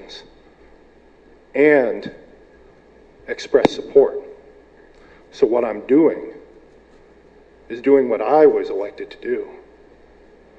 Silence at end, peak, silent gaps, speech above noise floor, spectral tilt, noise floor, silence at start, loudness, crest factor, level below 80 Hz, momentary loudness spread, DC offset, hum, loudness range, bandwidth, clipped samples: 1.05 s; 0 dBFS; none; 33 dB; -6 dB/octave; -49 dBFS; 0 s; -18 LUFS; 20 dB; -54 dBFS; 19 LU; under 0.1%; none; 4 LU; 7.8 kHz; under 0.1%